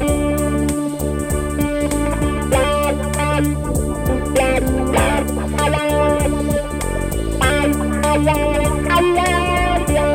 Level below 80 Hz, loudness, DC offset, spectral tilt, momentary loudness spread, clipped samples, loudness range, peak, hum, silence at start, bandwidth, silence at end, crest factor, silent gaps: -24 dBFS; -18 LUFS; under 0.1%; -5.5 dB/octave; 5 LU; under 0.1%; 2 LU; -2 dBFS; none; 0 s; 17 kHz; 0 s; 14 dB; none